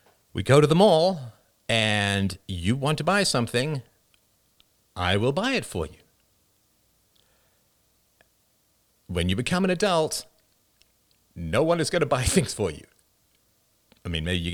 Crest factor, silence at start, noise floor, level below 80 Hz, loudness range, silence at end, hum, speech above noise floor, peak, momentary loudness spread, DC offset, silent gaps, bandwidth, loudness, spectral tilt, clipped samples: 20 dB; 0.35 s; -67 dBFS; -50 dBFS; 9 LU; 0 s; none; 43 dB; -6 dBFS; 16 LU; under 0.1%; none; over 20 kHz; -24 LUFS; -5 dB/octave; under 0.1%